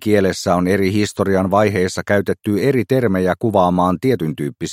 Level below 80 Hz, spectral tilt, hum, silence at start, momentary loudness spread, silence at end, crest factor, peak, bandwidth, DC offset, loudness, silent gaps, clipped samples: -50 dBFS; -6.5 dB/octave; none; 0 s; 4 LU; 0 s; 16 dB; 0 dBFS; 16 kHz; under 0.1%; -17 LUFS; none; under 0.1%